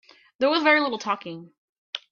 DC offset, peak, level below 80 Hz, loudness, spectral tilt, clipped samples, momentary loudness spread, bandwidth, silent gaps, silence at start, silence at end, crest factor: under 0.1%; -8 dBFS; -76 dBFS; -22 LUFS; -4 dB/octave; under 0.1%; 19 LU; 7.2 kHz; 1.58-1.93 s; 0.4 s; 0.15 s; 18 dB